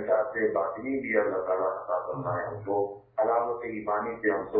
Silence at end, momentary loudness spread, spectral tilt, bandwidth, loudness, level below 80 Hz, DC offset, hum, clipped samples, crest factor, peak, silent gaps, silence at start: 0 s; 6 LU; -11.5 dB/octave; 3.7 kHz; -29 LUFS; -64 dBFS; under 0.1%; none; under 0.1%; 16 dB; -12 dBFS; none; 0 s